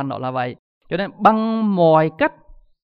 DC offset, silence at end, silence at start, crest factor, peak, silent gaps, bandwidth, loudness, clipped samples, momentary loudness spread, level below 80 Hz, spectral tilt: under 0.1%; 0.3 s; 0 s; 18 dB; 0 dBFS; 0.59-0.81 s; 5.8 kHz; -18 LUFS; under 0.1%; 11 LU; -54 dBFS; -9 dB/octave